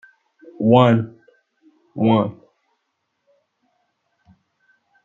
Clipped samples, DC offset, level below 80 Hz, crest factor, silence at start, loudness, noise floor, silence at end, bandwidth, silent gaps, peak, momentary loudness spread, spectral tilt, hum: under 0.1%; under 0.1%; -64 dBFS; 22 dB; 0.6 s; -17 LUFS; -74 dBFS; 2.7 s; 7.2 kHz; none; 0 dBFS; 17 LU; -9 dB/octave; none